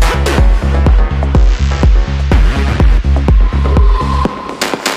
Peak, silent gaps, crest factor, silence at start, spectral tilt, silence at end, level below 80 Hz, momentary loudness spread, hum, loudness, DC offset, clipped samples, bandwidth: 0 dBFS; none; 10 dB; 0 s; -6 dB/octave; 0 s; -10 dBFS; 4 LU; none; -12 LUFS; under 0.1%; under 0.1%; 15 kHz